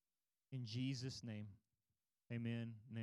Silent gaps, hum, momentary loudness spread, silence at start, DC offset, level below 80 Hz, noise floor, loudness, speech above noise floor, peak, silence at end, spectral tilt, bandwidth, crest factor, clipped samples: none; none; 9 LU; 0.5 s; under 0.1%; -84 dBFS; under -90 dBFS; -48 LUFS; over 43 dB; -34 dBFS; 0 s; -6 dB/octave; 11.5 kHz; 16 dB; under 0.1%